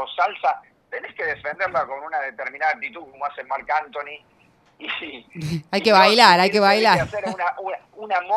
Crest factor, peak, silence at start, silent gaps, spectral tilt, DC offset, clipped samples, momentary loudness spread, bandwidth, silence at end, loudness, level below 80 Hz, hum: 22 dB; 0 dBFS; 0 s; none; -4 dB/octave; under 0.1%; under 0.1%; 19 LU; 14.5 kHz; 0 s; -20 LUFS; -58 dBFS; none